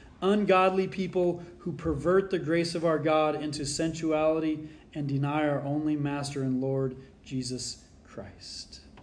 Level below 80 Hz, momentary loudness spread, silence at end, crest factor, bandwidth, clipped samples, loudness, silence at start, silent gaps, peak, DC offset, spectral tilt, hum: -54 dBFS; 16 LU; 0 s; 18 dB; 10.5 kHz; under 0.1%; -28 LUFS; 0 s; none; -12 dBFS; under 0.1%; -5.5 dB/octave; none